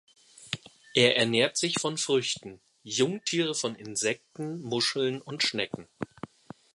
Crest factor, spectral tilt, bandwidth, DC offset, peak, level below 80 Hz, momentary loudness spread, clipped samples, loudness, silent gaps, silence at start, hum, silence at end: 22 dB; -3 dB/octave; 11.5 kHz; under 0.1%; -8 dBFS; -72 dBFS; 16 LU; under 0.1%; -28 LUFS; none; 0.4 s; none; 0.5 s